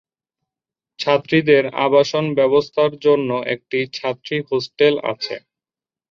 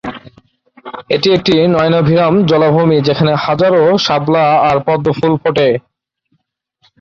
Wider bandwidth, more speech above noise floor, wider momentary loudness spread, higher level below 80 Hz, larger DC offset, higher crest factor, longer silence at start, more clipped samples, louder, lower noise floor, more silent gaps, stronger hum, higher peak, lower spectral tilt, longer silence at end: about the same, 7.2 kHz vs 7.2 kHz; first, over 72 dB vs 53 dB; first, 9 LU vs 4 LU; second, -62 dBFS vs -46 dBFS; neither; about the same, 16 dB vs 12 dB; first, 1 s vs 0.05 s; neither; second, -18 LUFS vs -11 LUFS; first, under -90 dBFS vs -64 dBFS; neither; neither; about the same, -2 dBFS vs 0 dBFS; about the same, -6 dB/octave vs -7 dB/octave; second, 0.75 s vs 1.2 s